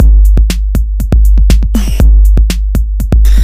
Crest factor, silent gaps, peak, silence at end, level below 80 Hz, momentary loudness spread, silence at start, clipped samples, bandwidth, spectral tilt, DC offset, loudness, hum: 6 dB; none; 0 dBFS; 0 s; -6 dBFS; 7 LU; 0 s; 2%; 15 kHz; -6.5 dB/octave; under 0.1%; -10 LUFS; none